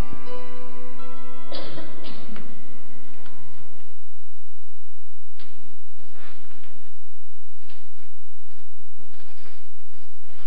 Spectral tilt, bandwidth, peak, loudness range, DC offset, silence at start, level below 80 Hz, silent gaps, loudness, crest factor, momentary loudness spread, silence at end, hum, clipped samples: -10 dB/octave; 5.4 kHz; -8 dBFS; 14 LU; 30%; 0 s; -62 dBFS; none; -43 LUFS; 24 dB; 22 LU; 0 s; none; under 0.1%